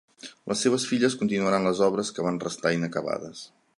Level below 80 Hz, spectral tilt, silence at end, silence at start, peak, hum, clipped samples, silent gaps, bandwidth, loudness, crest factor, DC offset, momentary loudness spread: -66 dBFS; -4.5 dB/octave; 0.3 s; 0.25 s; -8 dBFS; none; under 0.1%; none; 11.5 kHz; -26 LUFS; 18 dB; under 0.1%; 15 LU